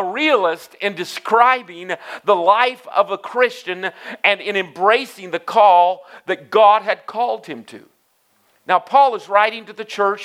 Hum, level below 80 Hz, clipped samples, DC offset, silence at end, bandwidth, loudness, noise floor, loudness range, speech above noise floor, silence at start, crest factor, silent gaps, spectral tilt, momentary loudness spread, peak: none; -82 dBFS; under 0.1%; under 0.1%; 0 s; 15 kHz; -17 LUFS; -61 dBFS; 3 LU; 44 dB; 0 s; 18 dB; none; -3.5 dB/octave; 14 LU; 0 dBFS